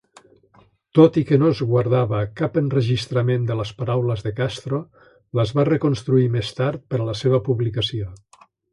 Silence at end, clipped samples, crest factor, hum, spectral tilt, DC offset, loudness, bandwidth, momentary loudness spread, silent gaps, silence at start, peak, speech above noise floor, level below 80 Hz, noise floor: 0.55 s; under 0.1%; 18 dB; none; -7.5 dB/octave; under 0.1%; -21 LUFS; 11 kHz; 9 LU; none; 0.95 s; -2 dBFS; 36 dB; -50 dBFS; -56 dBFS